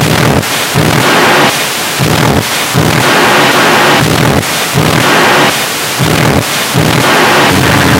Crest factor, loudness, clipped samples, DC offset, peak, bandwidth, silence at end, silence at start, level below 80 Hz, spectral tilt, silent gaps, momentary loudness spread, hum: 8 dB; -7 LUFS; 0.7%; under 0.1%; 0 dBFS; 17 kHz; 0 s; 0 s; -32 dBFS; -3.5 dB/octave; none; 5 LU; none